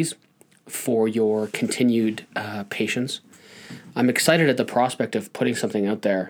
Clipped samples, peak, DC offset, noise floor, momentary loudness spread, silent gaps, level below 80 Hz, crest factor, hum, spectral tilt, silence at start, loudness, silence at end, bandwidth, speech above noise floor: under 0.1%; -4 dBFS; under 0.1%; -43 dBFS; 13 LU; none; -74 dBFS; 20 dB; none; -4.5 dB/octave; 0 s; -23 LUFS; 0 s; over 20 kHz; 20 dB